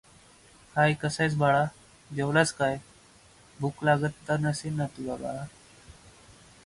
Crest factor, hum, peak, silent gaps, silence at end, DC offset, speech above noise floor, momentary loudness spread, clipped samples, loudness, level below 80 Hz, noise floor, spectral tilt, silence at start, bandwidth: 20 dB; none; -10 dBFS; none; 0.75 s; under 0.1%; 29 dB; 12 LU; under 0.1%; -28 LUFS; -60 dBFS; -56 dBFS; -5.5 dB/octave; 0.75 s; 11.5 kHz